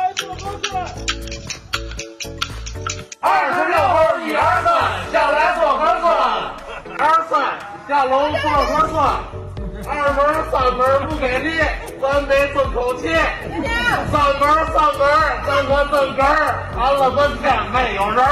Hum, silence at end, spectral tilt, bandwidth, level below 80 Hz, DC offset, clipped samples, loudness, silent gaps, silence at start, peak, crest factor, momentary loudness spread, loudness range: none; 0 s; -4.5 dB/octave; 15 kHz; -34 dBFS; under 0.1%; under 0.1%; -17 LUFS; none; 0 s; -4 dBFS; 14 dB; 11 LU; 3 LU